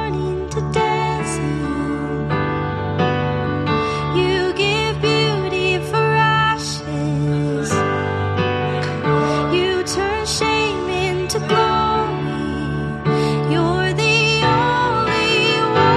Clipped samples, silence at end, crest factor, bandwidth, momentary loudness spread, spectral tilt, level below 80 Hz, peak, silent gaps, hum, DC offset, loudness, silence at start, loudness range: under 0.1%; 0 s; 16 dB; 13 kHz; 7 LU; -5 dB/octave; -38 dBFS; -2 dBFS; none; none; under 0.1%; -18 LUFS; 0 s; 3 LU